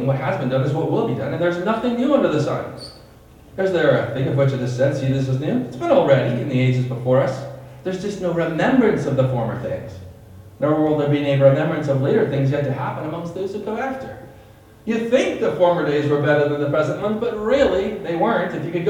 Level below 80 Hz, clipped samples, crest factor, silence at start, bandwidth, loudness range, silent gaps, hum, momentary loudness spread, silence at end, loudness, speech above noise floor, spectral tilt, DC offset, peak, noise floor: -50 dBFS; under 0.1%; 18 dB; 0 s; 10 kHz; 3 LU; none; none; 10 LU; 0 s; -20 LUFS; 26 dB; -7.5 dB/octave; under 0.1%; -2 dBFS; -45 dBFS